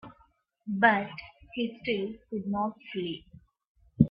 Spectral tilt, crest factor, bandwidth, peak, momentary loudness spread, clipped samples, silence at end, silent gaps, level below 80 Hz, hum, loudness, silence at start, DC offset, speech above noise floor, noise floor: -10 dB/octave; 26 dB; 5.4 kHz; -6 dBFS; 17 LU; under 0.1%; 0 s; 3.67-3.75 s; -58 dBFS; none; -30 LUFS; 0.05 s; under 0.1%; 36 dB; -66 dBFS